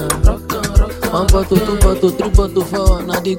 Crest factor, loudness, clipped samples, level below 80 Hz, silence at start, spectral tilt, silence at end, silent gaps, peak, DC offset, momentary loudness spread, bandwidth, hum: 14 dB; -15 LUFS; under 0.1%; -16 dBFS; 0 s; -5.5 dB/octave; 0 s; none; 0 dBFS; under 0.1%; 4 LU; 17 kHz; none